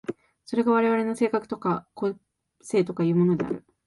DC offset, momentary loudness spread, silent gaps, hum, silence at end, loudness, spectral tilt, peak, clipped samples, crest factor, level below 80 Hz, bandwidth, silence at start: under 0.1%; 10 LU; none; none; 0.25 s; -25 LUFS; -7.5 dB/octave; -12 dBFS; under 0.1%; 14 dB; -66 dBFS; 11.5 kHz; 0.1 s